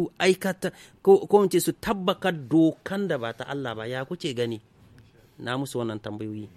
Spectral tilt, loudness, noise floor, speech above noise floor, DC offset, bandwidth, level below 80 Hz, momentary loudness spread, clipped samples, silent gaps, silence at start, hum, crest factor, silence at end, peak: -5.5 dB/octave; -25 LUFS; -54 dBFS; 29 dB; under 0.1%; 15 kHz; -60 dBFS; 13 LU; under 0.1%; none; 0 s; none; 20 dB; 0.1 s; -6 dBFS